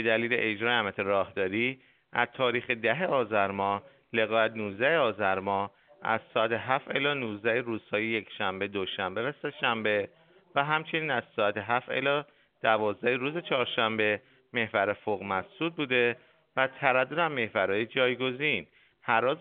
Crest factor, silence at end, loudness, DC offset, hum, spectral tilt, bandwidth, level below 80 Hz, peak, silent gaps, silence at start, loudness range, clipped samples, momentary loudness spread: 22 dB; 0 s; -29 LUFS; under 0.1%; none; -2 dB/octave; 4.6 kHz; -74 dBFS; -6 dBFS; none; 0 s; 2 LU; under 0.1%; 7 LU